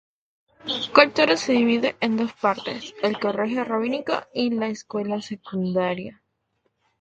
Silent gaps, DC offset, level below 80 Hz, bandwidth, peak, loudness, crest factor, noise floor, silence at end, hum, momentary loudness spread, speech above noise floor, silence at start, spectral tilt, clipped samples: none; under 0.1%; -64 dBFS; 8.6 kHz; 0 dBFS; -23 LUFS; 24 dB; -72 dBFS; 0.9 s; none; 12 LU; 50 dB; 0.65 s; -5 dB/octave; under 0.1%